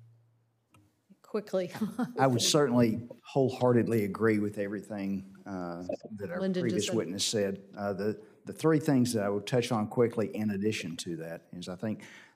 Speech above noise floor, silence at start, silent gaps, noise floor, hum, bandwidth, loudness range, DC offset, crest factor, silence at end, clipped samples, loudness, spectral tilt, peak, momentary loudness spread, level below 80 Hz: 40 dB; 1.35 s; none; -70 dBFS; none; 16 kHz; 5 LU; under 0.1%; 20 dB; 0.1 s; under 0.1%; -30 LUFS; -5 dB/octave; -12 dBFS; 13 LU; -78 dBFS